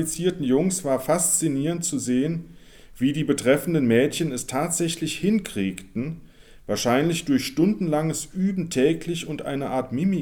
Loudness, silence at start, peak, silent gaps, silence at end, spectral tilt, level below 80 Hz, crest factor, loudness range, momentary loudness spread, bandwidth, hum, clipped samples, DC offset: -24 LUFS; 0 s; -8 dBFS; none; 0 s; -5 dB/octave; -52 dBFS; 16 dB; 2 LU; 9 LU; 20 kHz; none; under 0.1%; under 0.1%